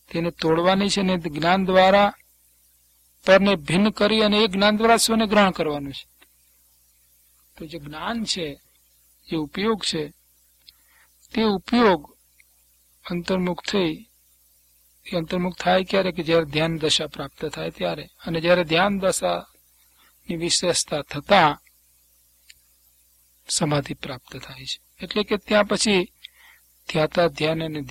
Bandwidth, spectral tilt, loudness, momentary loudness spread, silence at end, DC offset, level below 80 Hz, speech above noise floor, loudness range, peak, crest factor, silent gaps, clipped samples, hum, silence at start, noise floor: 16.5 kHz; -4 dB/octave; -21 LUFS; 16 LU; 0 s; under 0.1%; -52 dBFS; 39 dB; 10 LU; -2 dBFS; 22 dB; none; under 0.1%; 60 Hz at -50 dBFS; 0.1 s; -60 dBFS